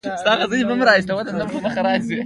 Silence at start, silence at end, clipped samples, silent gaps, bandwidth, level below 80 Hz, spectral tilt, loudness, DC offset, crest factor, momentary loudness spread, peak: 0.05 s; 0 s; under 0.1%; none; 11.5 kHz; -54 dBFS; -5 dB/octave; -19 LUFS; under 0.1%; 18 dB; 8 LU; -2 dBFS